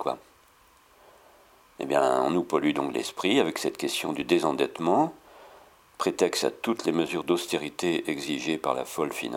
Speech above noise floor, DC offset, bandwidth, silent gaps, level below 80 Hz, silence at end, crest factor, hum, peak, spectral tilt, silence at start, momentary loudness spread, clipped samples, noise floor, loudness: 32 dB; under 0.1%; 17.5 kHz; none; -68 dBFS; 0 s; 20 dB; none; -8 dBFS; -4 dB/octave; 0 s; 6 LU; under 0.1%; -59 dBFS; -27 LUFS